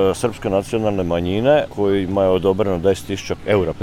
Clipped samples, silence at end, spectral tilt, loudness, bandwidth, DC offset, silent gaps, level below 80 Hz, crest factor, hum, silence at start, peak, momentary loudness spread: under 0.1%; 0 s; -6.5 dB/octave; -19 LUFS; 15 kHz; under 0.1%; none; -42 dBFS; 14 dB; none; 0 s; -4 dBFS; 5 LU